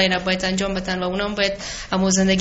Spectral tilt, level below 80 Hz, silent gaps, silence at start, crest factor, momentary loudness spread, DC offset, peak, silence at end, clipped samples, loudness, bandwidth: -3.5 dB/octave; -40 dBFS; none; 0 s; 16 dB; 6 LU; under 0.1%; -4 dBFS; 0 s; under 0.1%; -21 LUFS; 8 kHz